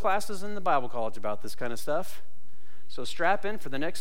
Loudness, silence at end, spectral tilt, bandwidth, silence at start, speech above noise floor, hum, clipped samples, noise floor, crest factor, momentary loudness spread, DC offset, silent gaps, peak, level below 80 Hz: -31 LUFS; 0 s; -4.5 dB/octave; 16.5 kHz; 0 s; 30 dB; none; under 0.1%; -61 dBFS; 18 dB; 12 LU; 7%; none; -12 dBFS; -60 dBFS